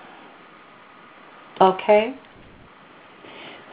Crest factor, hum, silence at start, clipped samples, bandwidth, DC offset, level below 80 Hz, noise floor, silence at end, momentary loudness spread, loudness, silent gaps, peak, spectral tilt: 22 dB; none; 1.6 s; under 0.1%; 4.9 kHz; under 0.1%; -64 dBFS; -48 dBFS; 0.2 s; 26 LU; -19 LUFS; none; -2 dBFS; -3.5 dB/octave